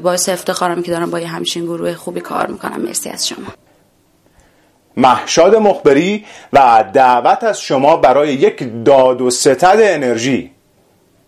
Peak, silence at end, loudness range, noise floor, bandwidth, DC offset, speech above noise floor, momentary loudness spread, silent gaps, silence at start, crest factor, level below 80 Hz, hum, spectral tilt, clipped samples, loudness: 0 dBFS; 0.8 s; 10 LU; -54 dBFS; 15 kHz; under 0.1%; 41 dB; 11 LU; none; 0 s; 14 dB; -52 dBFS; none; -4 dB/octave; under 0.1%; -13 LUFS